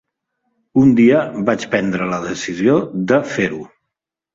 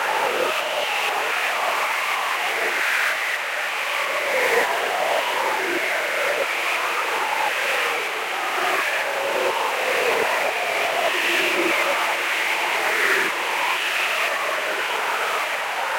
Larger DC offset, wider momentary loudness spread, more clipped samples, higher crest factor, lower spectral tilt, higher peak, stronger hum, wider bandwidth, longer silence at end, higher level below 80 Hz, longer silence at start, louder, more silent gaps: neither; first, 10 LU vs 4 LU; neither; about the same, 16 dB vs 16 dB; first, -6.5 dB/octave vs -0.5 dB/octave; first, -2 dBFS vs -8 dBFS; neither; second, 7.8 kHz vs 16.5 kHz; first, 0.7 s vs 0 s; first, -54 dBFS vs -74 dBFS; first, 0.75 s vs 0 s; first, -16 LUFS vs -21 LUFS; neither